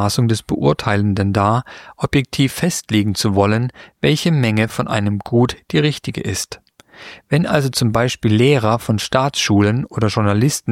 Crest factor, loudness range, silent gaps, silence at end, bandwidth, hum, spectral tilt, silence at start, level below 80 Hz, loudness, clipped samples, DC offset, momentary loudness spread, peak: 16 dB; 3 LU; none; 0 s; 16 kHz; none; -5.5 dB/octave; 0 s; -44 dBFS; -17 LUFS; under 0.1%; under 0.1%; 8 LU; -2 dBFS